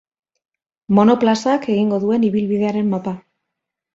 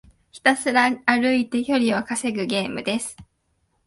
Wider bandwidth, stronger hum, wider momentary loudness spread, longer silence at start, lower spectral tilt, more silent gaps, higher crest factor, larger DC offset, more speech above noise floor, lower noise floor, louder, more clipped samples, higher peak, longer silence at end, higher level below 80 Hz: second, 7.8 kHz vs 11.5 kHz; neither; about the same, 9 LU vs 7 LU; first, 0.9 s vs 0.35 s; first, -7 dB/octave vs -3.5 dB/octave; neither; about the same, 16 dB vs 20 dB; neither; first, 65 dB vs 48 dB; first, -81 dBFS vs -69 dBFS; first, -17 LUFS vs -21 LUFS; neither; about the same, -2 dBFS vs -2 dBFS; about the same, 0.75 s vs 0.65 s; about the same, -60 dBFS vs -60 dBFS